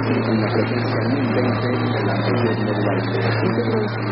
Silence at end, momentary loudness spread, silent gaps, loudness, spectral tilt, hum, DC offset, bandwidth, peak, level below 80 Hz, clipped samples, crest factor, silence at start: 0 s; 1 LU; none; -20 LUFS; -12 dB/octave; none; 0.3%; 5.8 kHz; -6 dBFS; -48 dBFS; under 0.1%; 12 dB; 0 s